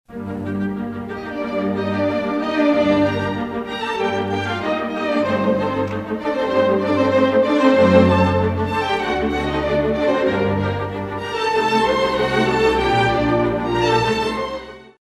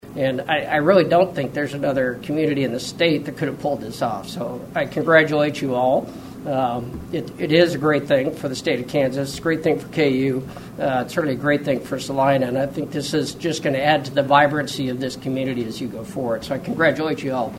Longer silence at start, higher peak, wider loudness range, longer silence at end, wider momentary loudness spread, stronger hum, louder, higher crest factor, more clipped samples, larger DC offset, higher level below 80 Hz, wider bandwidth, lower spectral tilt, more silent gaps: about the same, 0.1 s vs 0.05 s; about the same, 0 dBFS vs -2 dBFS; about the same, 4 LU vs 2 LU; first, 0.15 s vs 0 s; about the same, 10 LU vs 10 LU; neither; about the same, -19 LUFS vs -21 LUFS; about the same, 18 dB vs 20 dB; neither; neither; first, -42 dBFS vs -52 dBFS; second, 12.5 kHz vs 16.5 kHz; about the same, -6.5 dB/octave vs -5.5 dB/octave; neither